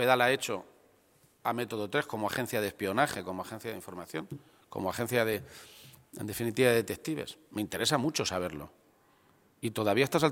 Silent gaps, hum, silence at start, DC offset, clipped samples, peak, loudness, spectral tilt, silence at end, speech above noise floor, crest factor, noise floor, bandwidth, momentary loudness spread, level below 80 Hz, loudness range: none; none; 0 s; under 0.1%; under 0.1%; -8 dBFS; -32 LUFS; -4 dB/octave; 0 s; 34 dB; 24 dB; -65 dBFS; 17 kHz; 17 LU; -66 dBFS; 3 LU